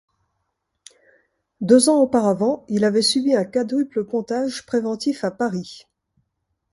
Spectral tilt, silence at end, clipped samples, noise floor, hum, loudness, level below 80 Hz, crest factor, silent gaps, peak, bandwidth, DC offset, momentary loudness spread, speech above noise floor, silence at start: -4.5 dB/octave; 0.95 s; under 0.1%; -75 dBFS; none; -20 LUFS; -62 dBFS; 20 dB; none; -2 dBFS; 11.5 kHz; under 0.1%; 10 LU; 56 dB; 1.6 s